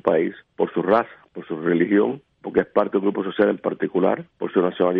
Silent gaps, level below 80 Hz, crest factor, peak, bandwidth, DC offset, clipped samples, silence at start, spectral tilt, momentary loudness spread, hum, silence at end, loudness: none; -62 dBFS; 16 dB; -4 dBFS; 4.8 kHz; under 0.1%; under 0.1%; 0.05 s; -10 dB/octave; 8 LU; none; 0 s; -22 LUFS